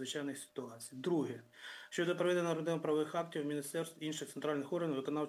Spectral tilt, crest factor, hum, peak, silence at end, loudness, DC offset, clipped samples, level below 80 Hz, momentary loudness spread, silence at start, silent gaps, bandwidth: -5 dB/octave; 16 dB; none; -22 dBFS; 0 s; -38 LUFS; under 0.1%; under 0.1%; under -90 dBFS; 12 LU; 0 s; none; 16 kHz